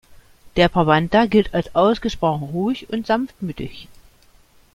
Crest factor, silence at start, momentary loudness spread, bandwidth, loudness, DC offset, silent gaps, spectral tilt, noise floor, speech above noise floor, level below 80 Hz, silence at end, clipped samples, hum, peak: 18 dB; 0.1 s; 13 LU; 14.5 kHz; -19 LUFS; under 0.1%; none; -7 dB/octave; -52 dBFS; 34 dB; -42 dBFS; 0.9 s; under 0.1%; none; -2 dBFS